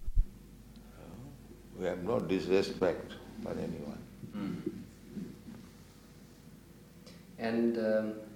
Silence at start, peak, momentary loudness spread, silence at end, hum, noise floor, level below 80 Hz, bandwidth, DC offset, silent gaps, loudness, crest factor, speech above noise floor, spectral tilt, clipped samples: 0 s; -16 dBFS; 24 LU; 0 s; none; -55 dBFS; -44 dBFS; 16.5 kHz; under 0.1%; none; -35 LUFS; 20 dB; 22 dB; -6.5 dB/octave; under 0.1%